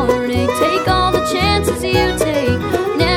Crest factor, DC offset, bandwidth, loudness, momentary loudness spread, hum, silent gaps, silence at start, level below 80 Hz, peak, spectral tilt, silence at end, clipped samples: 14 dB; under 0.1%; 17.5 kHz; -15 LUFS; 3 LU; none; none; 0 s; -30 dBFS; 0 dBFS; -5 dB/octave; 0 s; under 0.1%